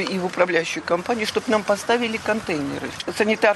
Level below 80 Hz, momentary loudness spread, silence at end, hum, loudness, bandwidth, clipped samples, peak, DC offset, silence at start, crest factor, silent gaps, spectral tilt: -58 dBFS; 6 LU; 0 s; none; -22 LUFS; 12.5 kHz; under 0.1%; -4 dBFS; under 0.1%; 0 s; 18 dB; none; -4 dB/octave